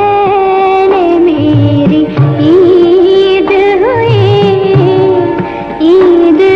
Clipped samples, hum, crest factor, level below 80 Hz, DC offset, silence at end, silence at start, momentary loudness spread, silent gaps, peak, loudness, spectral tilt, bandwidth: under 0.1%; none; 6 dB; -38 dBFS; under 0.1%; 0 s; 0 s; 4 LU; none; 0 dBFS; -7 LUFS; -9 dB/octave; 6.2 kHz